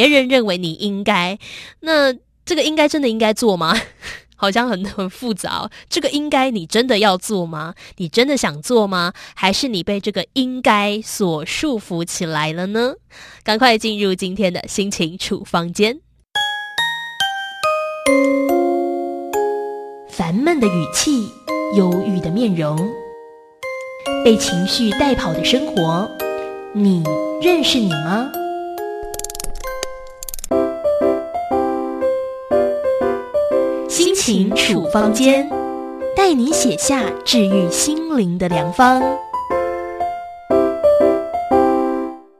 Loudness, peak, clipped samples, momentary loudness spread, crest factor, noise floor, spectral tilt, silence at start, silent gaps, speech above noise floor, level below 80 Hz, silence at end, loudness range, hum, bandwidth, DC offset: -18 LUFS; 0 dBFS; under 0.1%; 12 LU; 18 dB; -40 dBFS; -4 dB/octave; 0 s; none; 23 dB; -44 dBFS; 0.2 s; 4 LU; none; 14 kHz; under 0.1%